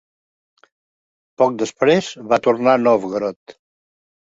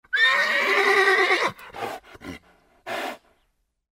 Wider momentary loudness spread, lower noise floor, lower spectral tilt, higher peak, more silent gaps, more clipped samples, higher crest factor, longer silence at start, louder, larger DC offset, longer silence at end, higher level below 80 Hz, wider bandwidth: second, 8 LU vs 21 LU; first, under -90 dBFS vs -71 dBFS; first, -5.5 dB/octave vs -2 dB/octave; first, 0 dBFS vs -6 dBFS; first, 3.36-3.46 s vs none; neither; about the same, 20 dB vs 18 dB; first, 1.4 s vs 0.1 s; about the same, -18 LUFS vs -20 LUFS; neither; about the same, 0.8 s vs 0.8 s; about the same, -62 dBFS vs -64 dBFS; second, 8 kHz vs 16 kHz